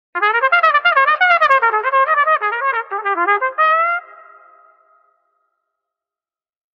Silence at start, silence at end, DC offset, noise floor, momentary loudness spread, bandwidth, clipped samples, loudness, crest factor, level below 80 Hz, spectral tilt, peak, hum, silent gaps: 0.15 s; 2.7 s; under 0.1%; under -90 dBFS; 7 LU; 7.4 kHz; under 0.1%; -14 LUFS; 16 dB; -64 dBFS; -2.5 dB/octave; 0 dBFS; none; none